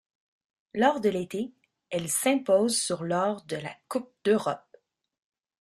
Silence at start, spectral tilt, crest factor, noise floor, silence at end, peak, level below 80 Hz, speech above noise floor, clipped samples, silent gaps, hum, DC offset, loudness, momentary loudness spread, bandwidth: 0.75 s; -4 dB/octave; 22 dB; -61 dBFS; 1.05 s; -8 dBFS; -70 dBFS; 34 dB; under 0.1%; none; none; under 0.1%; -27 LUFS; 12 LU; 14 kHz